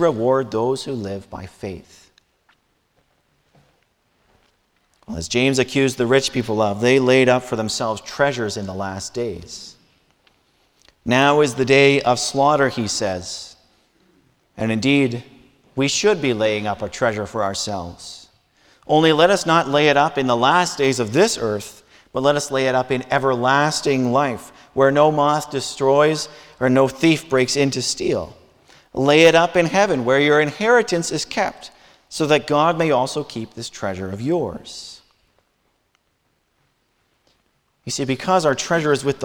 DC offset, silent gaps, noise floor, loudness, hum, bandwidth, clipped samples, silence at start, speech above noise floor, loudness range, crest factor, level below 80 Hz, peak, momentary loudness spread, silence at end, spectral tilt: under 0.1%; none; -67 dBFS; -18 LUFS; none; 18 kHz; under 0.1%; 0 s; 49 dB; 10 LU; 18 dB; -54 dBFS; 0 dBFS; 17 LU; 0 s; -4.5 dB/octave